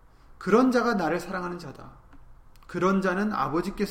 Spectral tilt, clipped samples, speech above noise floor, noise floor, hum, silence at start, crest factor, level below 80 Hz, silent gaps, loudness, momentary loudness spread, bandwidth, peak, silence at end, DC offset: -6.5 dB/octave; under 0.1%; 24 dB; -49 dBFS; none; 0.3 s; 20 dB; -52 dBFS; none; -26 LUFS; 15 LU; 16 kHz; -8 dBFS; 0 s; under 0.1%